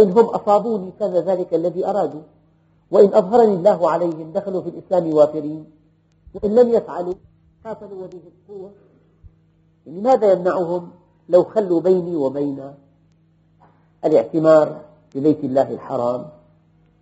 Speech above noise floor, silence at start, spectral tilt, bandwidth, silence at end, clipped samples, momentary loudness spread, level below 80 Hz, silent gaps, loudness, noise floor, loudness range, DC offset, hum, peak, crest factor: 39 dB; 0 s; -7.5 dB/octave; 8 kHz; 0.7 s; under 0.1%; 21 LU; -58 dBFS; none; -18 LUFS; -57 dBFS; 6 LU; under 0.1%; 50 Hz at -55 dBFS; 0 dBFS; 18 dB